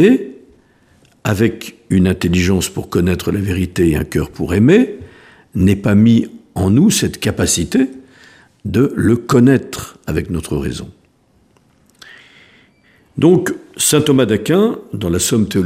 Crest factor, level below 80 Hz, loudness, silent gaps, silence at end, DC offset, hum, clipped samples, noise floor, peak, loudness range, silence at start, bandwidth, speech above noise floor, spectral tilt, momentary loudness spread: 16 dB; -38 dBFS; -15 LUFS; none; 0 s; under 0.1%; none; under 0.1%; -55 dBFS; 0 dBFS; 6 LU; 0 s; 15.5 kHz; 41 dB; -5.5 dB/octave; 13 LU